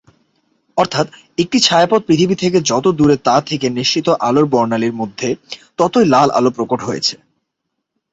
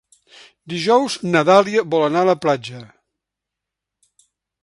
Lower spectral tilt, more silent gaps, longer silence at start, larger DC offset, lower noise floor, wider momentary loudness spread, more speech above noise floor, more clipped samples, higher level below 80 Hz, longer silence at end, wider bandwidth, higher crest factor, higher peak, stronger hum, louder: about the same, -4.5 dB/octave vs -5 dB/octave; neither; about the same, 0.75 s vs 0.7 s; neither; second, -75 dBFS vs -83 dBFS; second, 10 LU vs 14 LU; second, 60 dB vs 67 dB; neither; first, -52 dBFS vs -64 dBFS; second, 1 s vs 1.8 s; second, 8.2 kHz vs 11.5 kHz; about the same, 16 dB vs 20 dB; about the same, 0 dBFS vs 0 dBFS; neither; about the same, -15 LUFS vs -17 LUFS